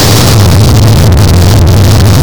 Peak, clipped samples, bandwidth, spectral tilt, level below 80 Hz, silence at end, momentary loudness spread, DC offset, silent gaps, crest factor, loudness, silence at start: 0 dBFS; 0.3%; over 20 kHz; -5.5 dB/octave; -14 dBFS; 0 s; 1 LU; 20%; none; 4 dB; -4 LUFS; 0 s